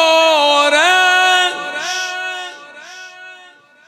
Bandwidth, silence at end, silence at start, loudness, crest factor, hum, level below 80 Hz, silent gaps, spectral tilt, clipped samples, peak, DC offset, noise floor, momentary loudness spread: 15 kHz; 0.5 s; 0 s; -12 LUFS; 16 dB; none; -68 dBFS; none; 1 dB/octave; under 0.1%; 0 dBFS; under 0.1%; -44 dBFS; 23 LU